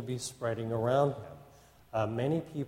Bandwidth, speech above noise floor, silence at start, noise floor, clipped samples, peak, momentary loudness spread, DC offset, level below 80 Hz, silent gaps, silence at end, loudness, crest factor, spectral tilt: 16.5 kHz; 26 dB; 0 s; -58 dBFS; under 0.1%; -16 dBFS; 10 LU; under 0.1%; -64 dBFS; none; 0 s; -32 LUFS; 18 dB; -6 dB/octave